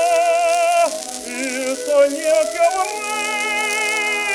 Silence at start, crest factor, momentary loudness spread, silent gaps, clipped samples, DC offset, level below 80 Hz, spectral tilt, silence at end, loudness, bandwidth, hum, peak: 0 s; 14 dB; 7 LU; none; under 0.1%; under 0.1%; -62 dBFS; 0 dB/octave; 0 s; -18 LUFS; over 20 kHz; none; -4 dBFS